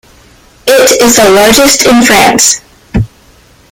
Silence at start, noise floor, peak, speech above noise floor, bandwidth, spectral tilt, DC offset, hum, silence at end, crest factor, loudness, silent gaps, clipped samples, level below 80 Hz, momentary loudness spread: 0.65 s; -41 dBFS; 0 dBFS; 36 dB; over 20 kHz; -2.5 dB/octave; under 0.1%; none; 0.65 s; 8 dB; -5 LUFS; none; 1%; -30 dBFS; 12 LU